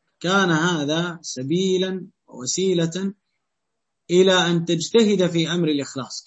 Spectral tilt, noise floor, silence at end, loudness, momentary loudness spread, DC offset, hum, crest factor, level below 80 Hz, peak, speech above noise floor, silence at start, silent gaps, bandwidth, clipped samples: -4.5 dB/octave; -81 dBFS; 0.05 s; -21 LUFS; 12 LU; under 0.1%; none; 16 dB; -66 dBFS; -4 dBFS; 60 dB; 0.2 s; none; 8.4 kHz; under 0.1%